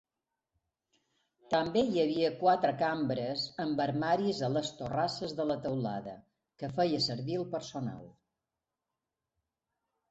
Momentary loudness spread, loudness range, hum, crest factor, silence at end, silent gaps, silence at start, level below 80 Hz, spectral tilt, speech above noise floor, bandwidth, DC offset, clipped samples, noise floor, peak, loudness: 10 LU; 6 LU; none; 18 dB; 2 s; none; 1.5 s; -68 dBFS; -6 dB/octave; 57 dB; 8.2 kHz; under 0.1%; under 0.1%; -89 dBFS; -14 dBFS; -32 LUFS